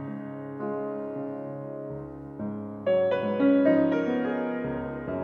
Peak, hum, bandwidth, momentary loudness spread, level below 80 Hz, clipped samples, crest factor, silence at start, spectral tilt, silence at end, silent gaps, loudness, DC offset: -10 dBFS; none; 5.2 kHz; 15 LU; -60 dBFS; under 0.1%; 18 dB; 0 s; -9 dB/octave; 0 s; none; -28 LUFS; under 0.1%